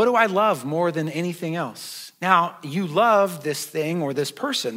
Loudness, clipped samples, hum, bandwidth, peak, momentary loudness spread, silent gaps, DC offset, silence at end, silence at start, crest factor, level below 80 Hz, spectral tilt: -22 LUFS; under 0.1%; none; 16 kHz; -2 dBFS; 10 LU; none; under 0.1%; 0 s; 0 s; 20 dB; -84 dBFS; -4.5 dB/octave